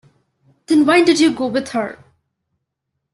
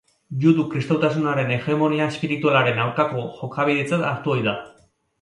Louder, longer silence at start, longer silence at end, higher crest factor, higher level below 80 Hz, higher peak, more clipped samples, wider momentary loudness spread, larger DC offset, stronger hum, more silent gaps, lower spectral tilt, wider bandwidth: first, -15 LUFS vs -21 LUFS; first, 0.7 s vs 0.3 s; first, 1.2 s vs 0.5 s; about the same, 16 dB vs 18 dB; about the same, -60 dBFS vs -62 dBFS; about the same, -2 dBFS vs -4 dBFS; neither; first, 12 LU vs 6 LU; neither; neither; neither; second, -4 dB/octave vs -7 dB/octave; about the same, 12 kHz vs 11 kHz